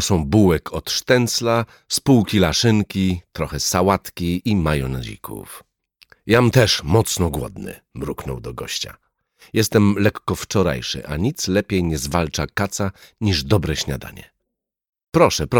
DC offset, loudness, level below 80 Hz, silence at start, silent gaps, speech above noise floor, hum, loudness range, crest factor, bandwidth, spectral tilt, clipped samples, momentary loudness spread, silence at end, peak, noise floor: under 0.1%; -19 LUFS; -38 dBFS; 0 s; 14.89-14.93 s; 60 dB; none; 4 LU; 18 dB; 19 kHz; -5 dB/octave; under 0.1%; 14 LU; 0 s; -2 dBFS; -79 dBFS